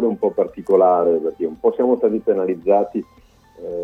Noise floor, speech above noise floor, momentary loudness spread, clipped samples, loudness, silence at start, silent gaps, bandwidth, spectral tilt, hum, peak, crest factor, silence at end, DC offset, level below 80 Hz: -43 dBFS; 26 dB; 10 LU; under 0.1%; -18 LUFS; 0 s; none; 3.7 kHz; -9.5 dB/octave; none; -4 dBFS; 16 dB; 0 s; under 0.1%; -56 dBFS